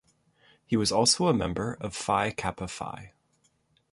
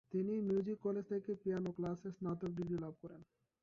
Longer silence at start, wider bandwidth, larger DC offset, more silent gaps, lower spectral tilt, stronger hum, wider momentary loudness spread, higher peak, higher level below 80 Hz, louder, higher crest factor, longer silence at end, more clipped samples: first, 0.7 s vs 0.1 s; first, 12 kHz vs 7.2 kHz; neither; neither; second, -3.5 dB/octave vs -9.5 dB/octave; neither; first, 15 LU vs 11 LU; first, -10 dBFS vs -28 dBFS; first, -52 dBFS vs -72 dBFS; first, -27 LUFS vs -41 LUFS; first, 20 dB vs 14 dB; first, 0.85 s vs 0.4 s; neither